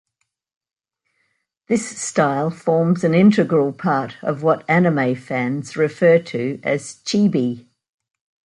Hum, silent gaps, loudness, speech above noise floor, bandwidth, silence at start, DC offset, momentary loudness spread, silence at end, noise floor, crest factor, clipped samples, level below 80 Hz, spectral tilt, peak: none; none; -19 LUFS; 56 dB; 11 kHz; 1.7 s; under 0.1%; 9 LU; 0.85 s; -74 dBFS; 16 dB; under 0.1%; -64 dBFS; -6 dB/octave; -2 dBFS